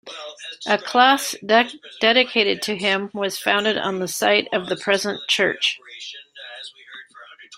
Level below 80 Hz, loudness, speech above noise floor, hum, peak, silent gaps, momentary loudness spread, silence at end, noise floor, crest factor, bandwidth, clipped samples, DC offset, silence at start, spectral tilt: -68 dBFS; -19 LUFS; 24 dB; none; -2 dBFS; none; 19 LU; 0 s; -45 dBFS; 20 dB; 16 kHz; under 0.1%; under 0.1%; 0.05 s; -2.5 dB/octave